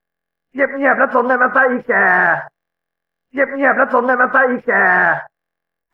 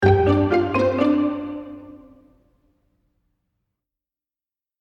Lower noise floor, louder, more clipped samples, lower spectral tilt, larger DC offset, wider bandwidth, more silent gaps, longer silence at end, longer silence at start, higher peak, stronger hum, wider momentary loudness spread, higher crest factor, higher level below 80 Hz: second, -82 dBFS vs under -90 dBFS; first, -14 LUFS vs -20 LUFS; neither; about the same, -8 dB/octave vs -8.5 dB/octave; neither; second, 5.4 kHz vs 7 kHz; neither; second, 0.65 s vs 2.85 s; first, 0.55 s vs 0 s; about the same, -2 dBFS vs -2 dBFS; neither; second, 8 LU vs 19 LU; second, 14 dB vs 20 dB; second, -66 dBFS vs -48 dBFS